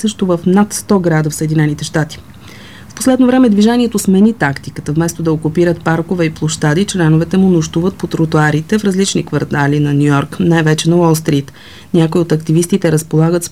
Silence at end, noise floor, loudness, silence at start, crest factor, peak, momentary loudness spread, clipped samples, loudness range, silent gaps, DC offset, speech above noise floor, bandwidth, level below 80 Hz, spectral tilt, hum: 0.05 s; -34 dBFS; -13 LUFS; 0 s; 12 dB; 0 dBFS; 6 LU; under 0.1%; 1 LU; none; 0.7%; 22 dB; 15.5 kHz; -42 dBFS; -6 dB/octave; none